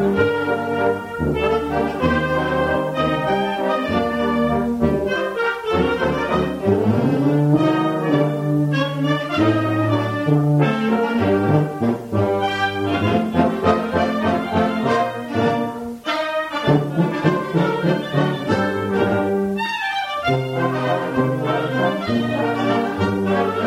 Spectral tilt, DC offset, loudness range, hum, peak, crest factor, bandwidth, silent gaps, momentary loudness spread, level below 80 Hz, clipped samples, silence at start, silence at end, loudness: -7.5 dB/octave; under 0.1%; 2 LU; none; -4 dBFS; 16 dB; 15.5 kHz; none; 4 LU; -44 dBFS; under 0.1%; 0 s; 0 s; -19 LUFS